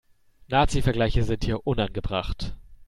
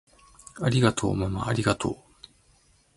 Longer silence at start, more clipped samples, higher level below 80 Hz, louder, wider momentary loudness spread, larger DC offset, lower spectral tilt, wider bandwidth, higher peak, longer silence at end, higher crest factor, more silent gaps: about the same, 0.5 s vs 0.55 s; neither; first, -32 dBFS vs -48 dBFS; about the same, -26 LUFS vs -26 LUFS; about the same, 10 LU vs 12 LU; neither; about the same, -6 dB/octave vs -5.5 dB/octave; about the same, 12.5 kHz vs 11.5 kHz; about the same, -6 dBFS vs -6 dBFS; second, 0.05 s vs 1 s; about the same, 18 dB vs 22 dB; neither